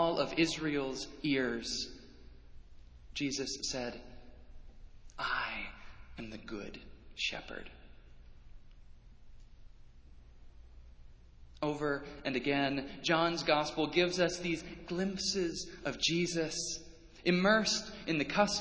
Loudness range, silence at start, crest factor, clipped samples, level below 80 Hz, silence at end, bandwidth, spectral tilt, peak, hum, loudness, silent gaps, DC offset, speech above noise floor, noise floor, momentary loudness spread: 12 LU; 0 s; 24 dB; under 0.1%; -56 dBFS; 0 s; 8 kHz; -3.5 dB/octave; -12 dBFS; none; -34 LUFS; none; under 0.1%; 21 dB; -55 dBFS; 16 LU